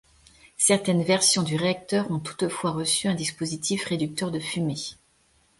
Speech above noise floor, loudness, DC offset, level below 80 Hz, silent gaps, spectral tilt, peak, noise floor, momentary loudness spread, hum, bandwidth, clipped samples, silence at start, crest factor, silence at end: 38 dB; -24 LUFS; under 0.1%; -62 dBFS; none; -3.5 dB/octave; -6 dBFS; -64 dBFS; 9 LU; none; 12 kHz; under 0.1%; 0.6 s; 20 dB; 0.65 s